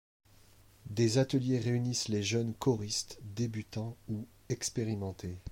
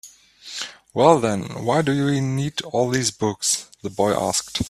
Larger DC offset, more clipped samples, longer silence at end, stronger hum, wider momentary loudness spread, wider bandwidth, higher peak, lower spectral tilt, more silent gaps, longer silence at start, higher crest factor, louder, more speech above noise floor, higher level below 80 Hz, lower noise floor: neither; neither; about the same, 0 s vs 0 s; neither; about the same, 12 LU vs 14 LU; first, 16.5 kHz vs 14.5 kHz; second, -18 dBFS vs 0 dBFS; about the same, -5 dB/octave vs -4.5 dB/octave; neither; first, 0.85 s vs 0.05 s; second, 16 dB vs 22 dB; second, -34 LUFS vs -21 LUFS; first, 27 dB vs 23 dB; second, -62 dBFS vs -52 dBFS; first, -60 dBFS vs -43 dBFS